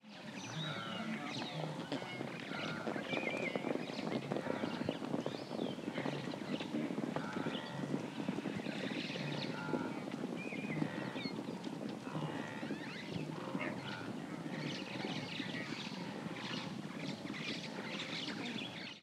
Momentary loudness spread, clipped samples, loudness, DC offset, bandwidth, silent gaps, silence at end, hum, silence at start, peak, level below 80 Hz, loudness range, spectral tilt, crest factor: 4 LU; under 0.1%; -42 LUFS; under 0.1%; 15 kHz; none; 0 s; none; 0.05 s; -22 dBFS; -80 dBFS; 3 LU; -5.5 dB/octave; 20 dB